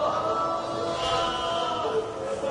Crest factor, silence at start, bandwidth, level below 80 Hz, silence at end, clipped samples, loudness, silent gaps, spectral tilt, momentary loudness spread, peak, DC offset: 14 dB; 0 s; 11 kHz; -52 dBFS; 0 s; under 0.1%; -27 LUFS; none; -4 dB/octave; 4 LU; -14 dBFS; under 0.1%